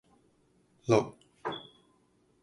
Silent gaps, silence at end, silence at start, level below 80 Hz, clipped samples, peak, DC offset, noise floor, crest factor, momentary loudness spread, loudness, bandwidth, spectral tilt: none; 0.8 s; 0.85 s; -68 dBFS; under 0.1%; -10 dBFS; under 0.1%; -69 dBFS; 24 dB; 15 LU; -32 LUFS; 11 kHz; -6 dB/octave